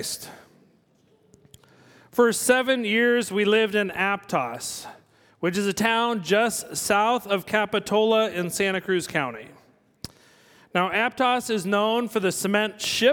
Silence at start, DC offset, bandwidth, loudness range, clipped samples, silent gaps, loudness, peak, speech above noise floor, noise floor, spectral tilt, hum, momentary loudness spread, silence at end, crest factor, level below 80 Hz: 0 s; under 0.1%; 19 kHz; 3 LU; under 0.1%; none; -23 LUFS; -6 dBFS; 39 dB; -62 dBFS; -3.5 dB/octave; none; 12 LU; 0 s; 20 dB; -64 dBFS